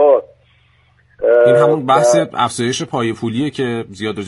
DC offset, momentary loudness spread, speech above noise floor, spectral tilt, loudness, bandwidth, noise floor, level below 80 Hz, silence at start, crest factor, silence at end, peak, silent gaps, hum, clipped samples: under 0.1%; 10 LU; 38 dB; -5 dB/octave; -15 LUFS; 11.5 kHz; -53 dBFS; -56 dBFS; 0 s; 14 dB; 0 s; 0 dBFS; none; none; under 0.1%